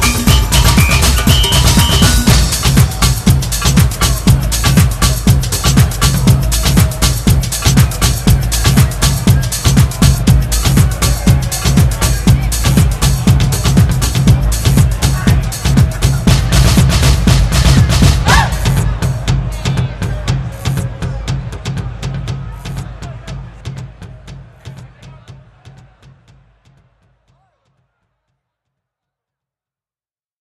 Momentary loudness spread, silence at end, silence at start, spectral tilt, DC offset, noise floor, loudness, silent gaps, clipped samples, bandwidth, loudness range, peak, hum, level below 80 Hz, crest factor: 12 LU; 4.7 s; 0 s; -4.5 dB/octave; under 0.1%; under -90 dBFS; -12 LUFS; none; 0.1%; 14.5 kHz; 13 LU; 0 dBFS; none; -18 dBFS; 12 dB